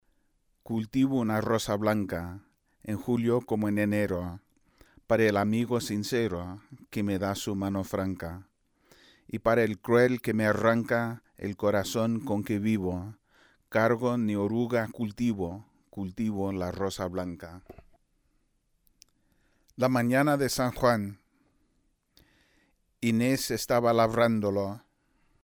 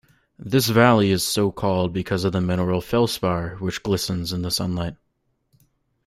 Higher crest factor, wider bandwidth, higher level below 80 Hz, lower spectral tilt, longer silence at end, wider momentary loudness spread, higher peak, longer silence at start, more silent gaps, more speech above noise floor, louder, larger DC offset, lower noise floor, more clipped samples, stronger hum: about the same, 18 dB vs 20 dB; first, over 20 kHz vs 16 kHz; second, -58 dBFS vs -50 dBFS; about the same, -6 dB/octave vs -5 dB/octave; second, 0.65 s vs 1.15 s; first, 14 LU vs 11 LU; second, -10 dBFS vs -2 dBFS; first, 0.7 s vs 0.4 s; neither; second, 45 dB vs 50 dB; second, -28 LUFS vs -22 LUFS; neither; about the same, -72 dBFS vs -71 dBFS; neither; neither